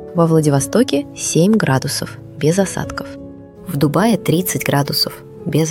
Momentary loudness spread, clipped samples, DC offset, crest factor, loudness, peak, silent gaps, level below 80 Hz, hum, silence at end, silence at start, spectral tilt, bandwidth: 15 LU; under 0.1%; under 0.1%; 16 dB; -16 LUFS; -2 dBFS; none; -46 dBFS; none; 0 s; 0 s; -5 dB/octave; 17.5 kHz